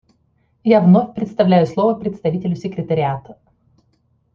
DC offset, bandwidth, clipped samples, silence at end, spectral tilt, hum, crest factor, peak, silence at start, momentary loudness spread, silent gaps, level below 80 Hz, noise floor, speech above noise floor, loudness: under 0.1%; 6.8 kHz; under 0.1%; 1 s; -9.5 dB/octave; none; 16 dB; -2 dBFS; 0.65 s; 11 LU; none; -56 dBFS; -62 dBFS; 46 dB; -17 LUFS